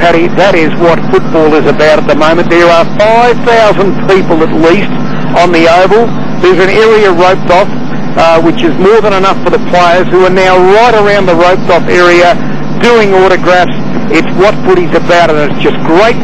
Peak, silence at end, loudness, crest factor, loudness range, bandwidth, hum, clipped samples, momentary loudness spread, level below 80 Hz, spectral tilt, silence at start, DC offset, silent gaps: 0 dBFS; 0 s; -6 LUFS; 8 dB; 2 LU; 9.8 kHz; none; 2%; 5 LU; -32 dBFS; -6 dB/octave; 0 s; 30%; none